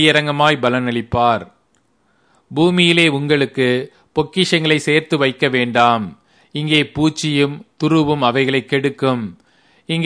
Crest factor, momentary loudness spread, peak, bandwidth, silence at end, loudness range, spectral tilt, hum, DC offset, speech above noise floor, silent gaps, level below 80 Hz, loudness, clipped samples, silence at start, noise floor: 16 dB; 9 LU; 0 dBFS; 10.5 kHz; 0 s; 2 LU; -5 dB/octave; none; under 0.1%; 45 dB; none; -52 dBFS; -16 LUFS; under 0.1%; 0 s; -61 dBFS